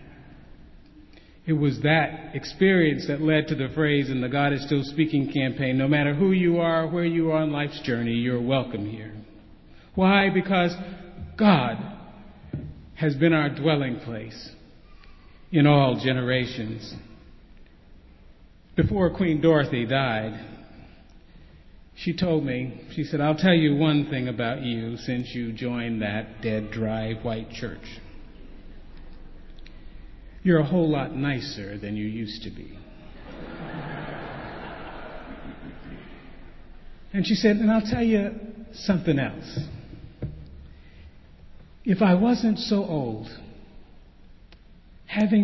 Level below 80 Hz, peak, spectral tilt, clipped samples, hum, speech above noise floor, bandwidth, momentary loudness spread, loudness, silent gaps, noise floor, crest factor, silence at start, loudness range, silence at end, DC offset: -48 dBFS; -4 dBFS; -7.5 dB/octave; under 0.1%; none; 27 dB; 6.2 kHz; 20 LU; -24 LUFS; none; -50 dBFS; 20 dB; 0 s; 10 LU; 0 s; under 0.1%